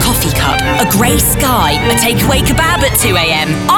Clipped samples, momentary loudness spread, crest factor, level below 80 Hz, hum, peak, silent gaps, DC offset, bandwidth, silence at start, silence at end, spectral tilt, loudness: under 0.1%; 2 LU; 10 dB; -22 dBFS; none; 0 dBFS; none; 0.4%; 19 kHz; 0 s; 0 s; -3.5 dB/octave; -10 LUFS